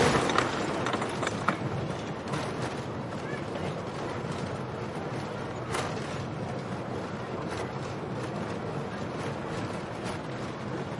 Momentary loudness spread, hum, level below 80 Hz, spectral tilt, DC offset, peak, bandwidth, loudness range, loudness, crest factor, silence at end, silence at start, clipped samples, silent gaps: 6 LU; none; -56 dBFS; -5.5 dB/octave; under 0.1%; -8 dBFS; 11.5 kHz; 3 LU; -33 LUFS; 24 dB; 0 s; 0 s; under 0.1%; none